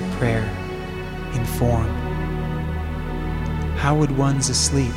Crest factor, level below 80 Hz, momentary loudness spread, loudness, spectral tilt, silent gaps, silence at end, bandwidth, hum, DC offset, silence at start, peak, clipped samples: 16 dB; -30 dBFS; 10 LU; -23 LUFS; -5 dB/octave; none; 0 s; 16.5 kHz; none; under 0.1%; 0 s; -4 dBFS; under 0.1%